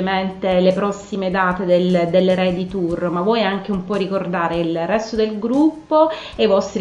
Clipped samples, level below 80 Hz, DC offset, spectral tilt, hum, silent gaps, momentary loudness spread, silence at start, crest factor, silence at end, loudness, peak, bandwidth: under 0.1%; -48 dBFS; under 0.1%; -6.5 dB/octave; none; none; 6 LU; 0 s; 16 dB; 0 s; -18 LUFS; -2 dBFS; 9.8 kHz